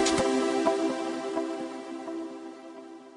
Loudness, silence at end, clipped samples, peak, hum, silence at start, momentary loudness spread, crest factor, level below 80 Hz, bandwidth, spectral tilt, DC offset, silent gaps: -30 LUFS; 0 s; under 0.1%; -12 dBFS; none; 0 s; 18 LU; 18 dB; -62 dBFS; 11 kHz; -3.5 dB/octave; under 0.1%; none